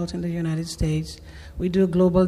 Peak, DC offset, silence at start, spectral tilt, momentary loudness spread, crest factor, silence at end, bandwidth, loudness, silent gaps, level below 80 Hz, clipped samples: -8 dBFS; under 0.1%; 0 s; -7.5 dB/octave; 18 LU; 14 dB; 0 s; 13 kHz; -24 LUFS; none; -38 dBFS; under 0.1%